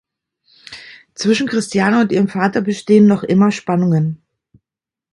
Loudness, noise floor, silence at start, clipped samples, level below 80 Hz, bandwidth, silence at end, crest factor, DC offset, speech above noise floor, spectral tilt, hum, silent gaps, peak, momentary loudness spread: -15 LUFS; -88 dBFS; 0.7 s; under 0.1%; -58 dBFS; 11.5 kHz; 1 s; 16 dB; under 0.1%; 74 dB; -6.5 dB/octave; none; none; 0 dBFS; 23 LU